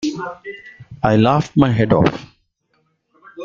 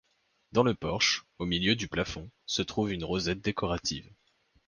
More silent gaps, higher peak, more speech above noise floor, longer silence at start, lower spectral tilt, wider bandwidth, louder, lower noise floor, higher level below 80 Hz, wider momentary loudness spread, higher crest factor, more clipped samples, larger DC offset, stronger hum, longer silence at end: neither; first, -2 dBFS vs -10 dBFS; first, 49 dB vs 39 dB; second, 0 s vs 0.55 s; first, -7.5 dB/octave vs -4 dB/octave; second, 7.6 kHz vs 10.5 kHz; first, -16 LUFS vs -30 LUFS; second, -65 dBFS vs -70 dBFS; first, -44 dBFS vs -52 dBFS; first, 20 LU vs 7 LU; about the same, 18 dB vs 22 dB; neither; neither; neither; second, 0 s vs 0.65 s